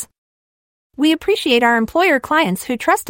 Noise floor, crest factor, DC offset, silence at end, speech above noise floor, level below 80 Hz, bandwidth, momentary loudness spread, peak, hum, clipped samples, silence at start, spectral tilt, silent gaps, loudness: under -90 dBFS; 14 dB; under 0.1%; 0 s; over 74 dB; -52 dBFS; 16.5 kHz; 6 LU; -2 dBFS; none; under 0.1%; 0 s; -4 dB/octave; 0.18-0.90 s; -16 LUFS